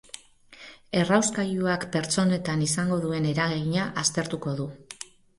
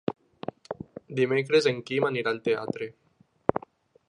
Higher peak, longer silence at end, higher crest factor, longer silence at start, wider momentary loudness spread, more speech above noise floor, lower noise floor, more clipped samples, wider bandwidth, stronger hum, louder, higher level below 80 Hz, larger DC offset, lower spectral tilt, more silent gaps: second, -6 dBFS vs -2 dBFS; second, 0.35 s vs 0.5 s; second, 20 dB vs 26 dB; about the same, 0.15 s vs 0.1 s; about the same, 19 LU vs 17 LU; about the same, 25 dB vs 28 dB; about the same, -51 dBFS vs -54 dBFS; neither; about the same, 11.5 kHz vs 10.5 kHz; neither; about the same, -26 LUFS vs -27 LUFS; first, -58 dBFS vs -64 dBFS; neither; about the same, -4.5 dB/octave vs -5.5 dB/octave; neither